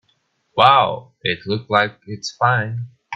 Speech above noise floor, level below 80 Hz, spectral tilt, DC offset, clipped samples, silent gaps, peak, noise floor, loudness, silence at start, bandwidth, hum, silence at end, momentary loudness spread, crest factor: 48 dB; -60 dBFS; -4.5 dB/octave; under 0.1%; under 0.1%; none; 0 dBFS; -65 dBFS; -18 LUFS; 0.55 s; 8 kHz; none; 0 s; 16 LU; 20 dB